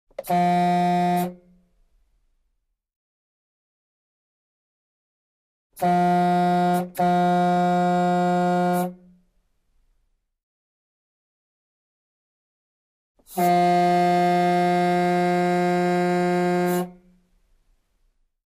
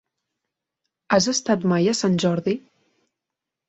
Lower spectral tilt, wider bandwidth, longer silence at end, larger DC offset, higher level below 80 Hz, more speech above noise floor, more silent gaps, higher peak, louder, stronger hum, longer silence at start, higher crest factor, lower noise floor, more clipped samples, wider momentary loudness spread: first, -7 dB/octave vs -4.5 dB/octave; first, 15.5 kHz vs 8.2 kHz; first, 1.55 s vs 1.1 s; neither; about the same, -64 dBFS vs -60 dBFS; second, 54 dB vs 65 dB; first, 2.96-5.70 s, 10.43-13.15 s vs none; second, -8 dBFS vs -4 dBFS; about the same, -21 LUFS vs -21 LUFS; neither; second, 0.2 s vs 1.1 s; about the same, 16 dB vs 18 dB; second, -74 dBFS vs -85 dBFS; neither; about the same, 6 LU vs 6 LU